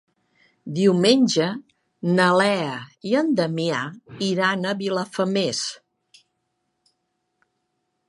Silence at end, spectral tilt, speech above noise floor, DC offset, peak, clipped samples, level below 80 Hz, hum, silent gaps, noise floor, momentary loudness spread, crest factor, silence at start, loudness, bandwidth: 2.35 s; -5 dB/octave; 54 dB; under 0.1%; -2 dBFS; under 0.1%; -70 dBFS; none; none; -75 dBFS; 13 LU; 20 dB; 0.65 s; -22 LUFS; 11.5 kHz